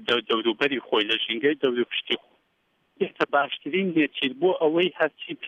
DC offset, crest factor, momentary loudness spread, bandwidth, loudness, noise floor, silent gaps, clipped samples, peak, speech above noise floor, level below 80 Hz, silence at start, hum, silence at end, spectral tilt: under 0.1%; 18 dB; 5 LU; 7.4 kHz; -24 LUFS; -70 dBFS; none; under 0.1%; -8 dBFS; 45 dB; -72 dBFS; 0 s; none; 0 s; -6 dB/octave